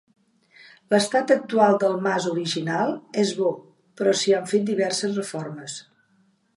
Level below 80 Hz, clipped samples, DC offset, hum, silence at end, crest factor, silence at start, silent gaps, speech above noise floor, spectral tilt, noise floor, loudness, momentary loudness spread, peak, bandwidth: -74 dBFS; under 0.1%; under 0.1%; none; 0.75 s; 20 dB; 0.9 s; none; 41 dB; -4.5 dB/octave; -64 dBFS; -23 LUFS; 14 LU; -4 dBFS; 11.5 kHz